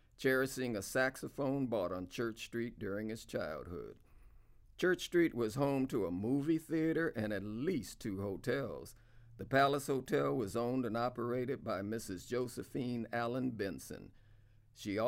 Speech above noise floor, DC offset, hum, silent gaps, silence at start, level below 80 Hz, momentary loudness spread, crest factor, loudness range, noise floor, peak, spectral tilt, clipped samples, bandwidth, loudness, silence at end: 26 dB; under 0.1%; none; none; 0.2 s; -64 dBFS; 10 LU; 20 dB; 5 LU; -63 dBFS; -18 dBFS; -5.5 dB/octave; under 0.1%; 16 kHz; -37 LUFS; 0 s